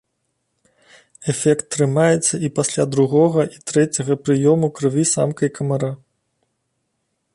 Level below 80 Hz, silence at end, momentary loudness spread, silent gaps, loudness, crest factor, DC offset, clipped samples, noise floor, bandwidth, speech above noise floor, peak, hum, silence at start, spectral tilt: -60 dBFS; 1.4 s; 7 LU; none; -18 LUFS; 16 dB; under 0.1%; under 0.1%; -72 dBFS; 11.5 kHz; 55 dB; -4 dBFS; none; 1.2 s; -5.5 dB/octave